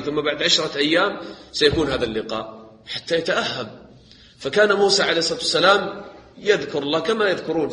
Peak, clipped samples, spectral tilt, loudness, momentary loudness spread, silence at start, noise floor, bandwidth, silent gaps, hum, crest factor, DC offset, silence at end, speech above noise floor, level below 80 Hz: 0 dBFS; under 0.1%; -3 dB/octave; -20 LUFS; 14 LU; 0 s; -48 dBFS; 10 kHz; none; none; 20 dB; under 0.1%; 0 s; 27 dB; -50 dBFS